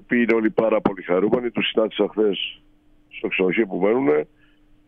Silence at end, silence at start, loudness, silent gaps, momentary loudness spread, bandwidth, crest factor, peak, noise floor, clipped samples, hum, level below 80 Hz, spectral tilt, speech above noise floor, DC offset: 0.65 s; 0.1 s; -21 LUFS; none; 8 LU; 5 kHz; 18 dB; -4 dBFS; -54 dBFS; under 0.1%; none; -56 dBFS; -8 dB/octave; 34 dB; under 0.1%